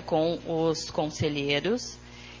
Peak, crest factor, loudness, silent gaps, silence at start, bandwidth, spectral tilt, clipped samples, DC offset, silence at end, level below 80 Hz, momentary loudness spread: -12 dBFS; 18 dB; -28 LUFS; none; 0 s; 7.6 kHz; -5 dB/octave; under 0.1%; under 0.1%; 0 s; -52 dBFS; 13 LU